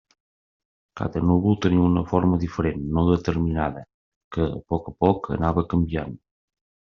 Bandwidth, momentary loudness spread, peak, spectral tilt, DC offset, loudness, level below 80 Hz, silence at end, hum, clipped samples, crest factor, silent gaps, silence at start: 6.8 kHz; 9 LU; -4 dBFS; -8 dB/octave; under 0.1%; -23 LUFS; -42 dBFS; 0.8 s; none; under 0.1%; 20 dB; 3.94-4.31 s; 0.95 s